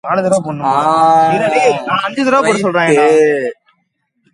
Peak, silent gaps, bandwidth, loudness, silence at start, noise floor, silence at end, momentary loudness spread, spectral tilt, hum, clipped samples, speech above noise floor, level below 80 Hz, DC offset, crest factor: 0 dBFS; none; 11.5 kHz; -12 LUFS; 0.05 s; -65 dBFS; 0.8 s; 6 LU; -5 dB/octave; none; under 0.1%; 53 dB; -58 dBFS; under 0.1%; 12 dB